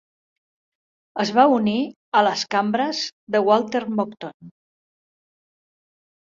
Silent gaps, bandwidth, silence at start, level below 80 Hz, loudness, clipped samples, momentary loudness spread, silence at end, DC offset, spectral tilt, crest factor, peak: 1.96-2.12 s, 3.12-3.27 s, 4.34-4.40 s; 7.6 kHz; 1.15 s; -68 dBFS; -21 LUFS; under 0.1%; 12 LU; 1.75 s; under 0.1%; -4.5 dB/octave; 20 dB; -2 dBFS